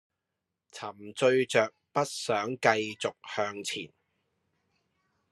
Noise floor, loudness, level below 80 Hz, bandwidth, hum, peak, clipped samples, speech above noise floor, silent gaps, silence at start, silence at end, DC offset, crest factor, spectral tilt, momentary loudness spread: -86 dBFS; -29 LUFS; -80 dBFS; 12.5 kHz; none; -8 dBFS; under 0.1%; 56 dB; none; 0.75 s; 1.45 s; under 0.1%; 24 dB; -3.5 dB/octave; 16 LU